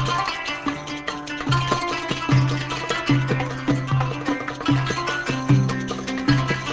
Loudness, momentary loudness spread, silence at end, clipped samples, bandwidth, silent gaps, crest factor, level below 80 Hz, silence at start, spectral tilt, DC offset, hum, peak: -23 LUFS; 7 LU; 0 s; under 0.1%; 8 kHz; none; 18 dB; -44 dBFS; 0 s; -5.5 dB/octave; under 0.1%; none; -4 dBFS